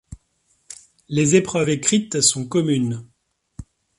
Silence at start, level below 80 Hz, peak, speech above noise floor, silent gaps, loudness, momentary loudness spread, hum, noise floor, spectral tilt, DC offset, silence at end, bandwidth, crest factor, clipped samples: 0.1 s; -52 dBFS; -2 dBFS; 46 dB; none; -19 LUFS; 23 LU; none; -66 dBFS; -4 dB/octave; under 0.1%; 0.35 s; 11.5 kHz; 20 dB; under 0.1%